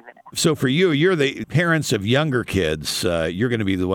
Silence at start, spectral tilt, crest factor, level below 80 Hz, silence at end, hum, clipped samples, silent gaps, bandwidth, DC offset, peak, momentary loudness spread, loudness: 0.05 s; -5 dB/octave; 16 dB; -50 dBFS; 0 s; none; under 0.1%; none; 19 kHz; under 0.1%; -4 dBFS; 5 LU; -20 LUFS